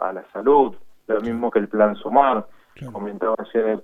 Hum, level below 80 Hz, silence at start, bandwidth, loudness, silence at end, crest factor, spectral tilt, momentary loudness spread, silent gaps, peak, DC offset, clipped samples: none; -56 dBFS; 0 s; 4 kHz; -20 LUFS; 0 s; 20 dB; -8 dB/octave; 13 LU; none; -2 dBFS; under 0.1%; under 0.1%